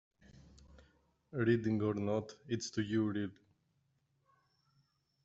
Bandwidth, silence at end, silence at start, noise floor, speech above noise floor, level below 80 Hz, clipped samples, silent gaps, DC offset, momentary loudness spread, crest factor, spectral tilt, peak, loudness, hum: 8 kHz; 1.9 s; 0.75 s; -78 dBFS; 43 dB; -70 dBFS; under 0.1%; none; under 0.1%; 9 LU; 20 dB; -6.5 dB/octave; -20 dBFS; -36 LUFS; none